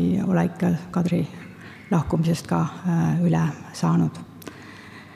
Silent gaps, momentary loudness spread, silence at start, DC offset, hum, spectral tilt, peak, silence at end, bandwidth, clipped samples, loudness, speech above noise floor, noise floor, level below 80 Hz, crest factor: none; 19 LU; 0 s; under 0.1%; none; -7.5 dB/octave; -8 dBFS; 0 s; 13 kHz; under 0.1%; -23 LUFS; 20 dB; -42 dBFS; -52 dBFS; 16 dB